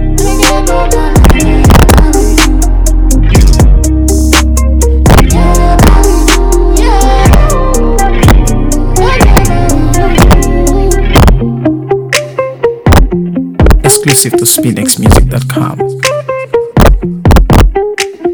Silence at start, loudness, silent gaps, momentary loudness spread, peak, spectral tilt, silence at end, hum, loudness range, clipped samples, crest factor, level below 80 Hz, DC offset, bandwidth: 0 s; -8 LUFS; none; 6 LU; 0 dBFS; -5 dB/octave; 0 s; none; 2 LU; 10%; 6 dB; -8 dBFS; under 0.1%; over 20 kHz